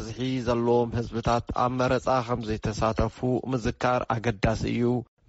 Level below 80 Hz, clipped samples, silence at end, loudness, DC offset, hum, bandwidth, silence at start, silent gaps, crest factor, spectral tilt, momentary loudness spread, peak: -42 dBFS; under 0.1%; 0.25 s; -27 LUFS; under 0.1%; none; 8 kHz; 0 s; none; 14 dB; -6 dB/octave; 5 LU; -12 dBFS